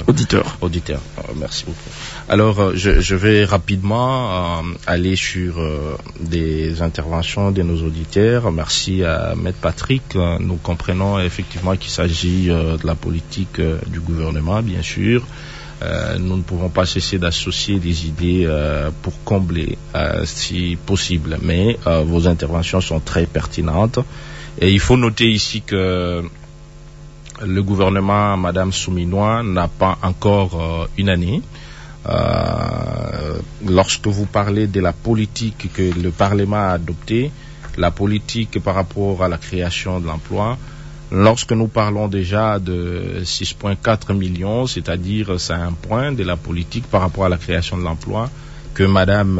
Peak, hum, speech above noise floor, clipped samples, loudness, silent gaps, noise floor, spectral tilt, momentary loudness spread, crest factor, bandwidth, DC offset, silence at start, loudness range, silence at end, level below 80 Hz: -2 dBFS; none; 20 dB; under 0.1%; -18 LUFS; none; -37 dBFS; -5.5 dB/octave; 9 LU; 16 dB; 8 kHz; under 0.1%; 0 s; 3 LU; 0 s; -30 dBFS